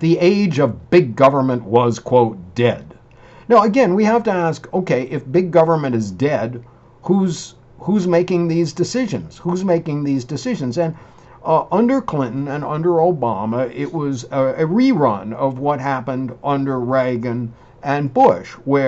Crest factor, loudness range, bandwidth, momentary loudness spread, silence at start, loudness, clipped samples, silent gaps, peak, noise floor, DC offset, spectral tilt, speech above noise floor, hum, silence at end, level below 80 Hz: 16 dB; 4 LU; 8.2 kHz; 9 LU; 0 s; -18 LUFS; under 0.1%; none; -2 dBFS; -44 dBFS; under 0.1%; -7 dB/octave; 27 dB; none; 0 s; -52 dBFS